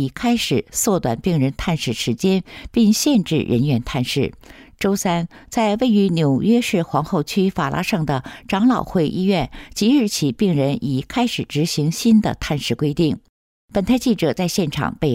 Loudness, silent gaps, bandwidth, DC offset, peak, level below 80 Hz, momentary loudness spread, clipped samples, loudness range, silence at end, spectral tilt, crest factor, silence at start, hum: -19 LUFS; 13.29-13.68 s; 16 kHz; under 0.1%; -6 dBFS; -42 dBFS; 6 LU; under 0.1%; 1 LU; 0 s; -5.5 dB/octave; 12 dB; 0 s; none